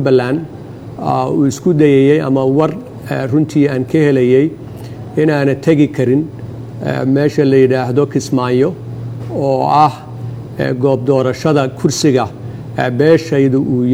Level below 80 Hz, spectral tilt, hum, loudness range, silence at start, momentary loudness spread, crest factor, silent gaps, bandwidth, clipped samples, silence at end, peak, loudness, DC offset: -48 dBFS; -7 dB/octave; none; 2 LU; 0 s; 15 LU; 14 dB; none; 15 kHz; under 0.1%; 0 s; 0 dBFS; -13 LUFS; under 0.1%